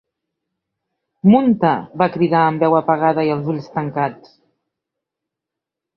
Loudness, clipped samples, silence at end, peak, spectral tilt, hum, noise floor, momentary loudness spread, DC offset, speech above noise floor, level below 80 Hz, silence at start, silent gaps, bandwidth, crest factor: -17 LUFS; under 0.1%; 1.8 s; -2 dBFS; -10 dB/octave; none; -84 dBFS; 10 LU; under 0.1%; 68 dB; -60 dBFS; 1.25 s; none; 5.8 kHz; 18 dB